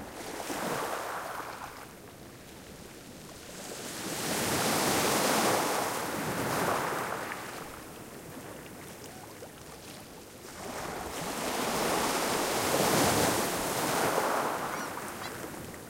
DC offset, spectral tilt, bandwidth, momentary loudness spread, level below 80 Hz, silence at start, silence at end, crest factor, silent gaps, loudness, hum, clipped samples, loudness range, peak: under 0.1%; -3 dB/octave; 16.5 kHz; 20 LU; -58 dBFS; 0 s; 0 s; 18 dB; none; -30 LUFS; none; under 0.1%; 13 LU; -14 dBFS